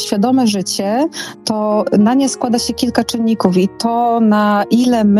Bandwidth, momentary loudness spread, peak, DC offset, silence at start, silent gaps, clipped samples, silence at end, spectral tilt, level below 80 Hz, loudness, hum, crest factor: 14 kHz; 5 LU; 0 dBFS; under 0.1%; 0 s; none; under 0.1%; 0 s; -5 dB/octave; -50 dBFS; -14 LUFS; none; 14 dB